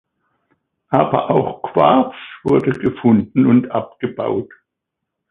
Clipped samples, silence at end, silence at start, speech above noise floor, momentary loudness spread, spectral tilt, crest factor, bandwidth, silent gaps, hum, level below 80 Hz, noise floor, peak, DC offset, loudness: under 0.1%; 0.85 s; 0.9 s; 63 dB; 10 LU; -9.5 dB/octave; 18 dB; 4 kHz; none; none; -52 dBFS; -79 dBFS; 0 dBFS; under 0.1%; -17 LUFS